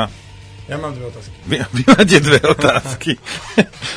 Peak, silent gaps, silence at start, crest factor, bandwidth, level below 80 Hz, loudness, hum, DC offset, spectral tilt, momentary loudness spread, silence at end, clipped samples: 0 dBFS; none; 0 s; 16 dB; 11 kHz; -42 dBFS; -14 LUFS; none; under 0.1%; -5 dB/octave; 19 LU; 0 s; 0.2%